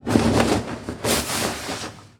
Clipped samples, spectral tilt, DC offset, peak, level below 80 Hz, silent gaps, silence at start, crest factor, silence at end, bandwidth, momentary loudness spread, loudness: under 0.1%; -4 dB/octave; under 0.1%; -2 dBFS; -40 dBFS; none; 0.05 s; 22 dB; 0.15 s; 20 kHz; 11 LU; -23 LUFS